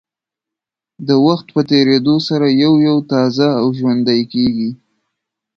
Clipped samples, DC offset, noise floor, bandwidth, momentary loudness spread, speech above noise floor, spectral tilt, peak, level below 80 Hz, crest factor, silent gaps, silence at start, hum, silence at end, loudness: under 0.1%; under 0.1%; -85 dBFS; 6.8 kHz; 5 LU; 72 dB; -7 dB/octave; 0 dBFS; -56 dBFS; 14 dB; none; 1 s; none; 0.8 s; -14 LUFS